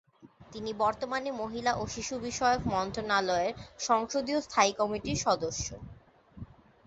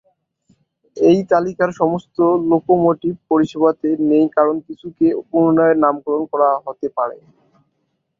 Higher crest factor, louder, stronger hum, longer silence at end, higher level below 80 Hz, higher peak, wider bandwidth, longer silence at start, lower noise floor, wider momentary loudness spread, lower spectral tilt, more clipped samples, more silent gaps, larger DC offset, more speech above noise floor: about the same, 20 dB vs 16 dB; second, -30 LUFS vs -17 LUFS; neither; second, 0.35 s vs 1.05 s; first, -54 dBFS vs -60 dBFS; second, -10 dBFS vs -2 dBFS; first, 8.2 kHz vs 7.2 kHz; second, 0.25 s vs 0.95 s; second, -55 dBFS vs -70 dBFS; first, 20 LU vs 9 LU; second, -3.5 dB/octave vs -8.5 dB/octave; neither; neither; neither; second, 25 dB vs 54 dB